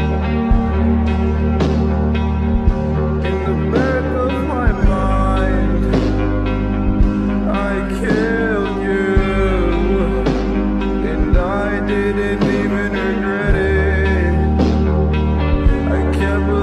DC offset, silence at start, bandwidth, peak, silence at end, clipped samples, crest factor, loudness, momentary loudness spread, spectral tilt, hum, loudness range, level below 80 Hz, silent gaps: under 0.1%; 0 s; 9.4 kHz; -4 dBFS; 0 s; under 0.1%; 10 dB; -17 LUFS; 3 LU; -8 dB/octave; none; 1 LU; -20 dBFS; none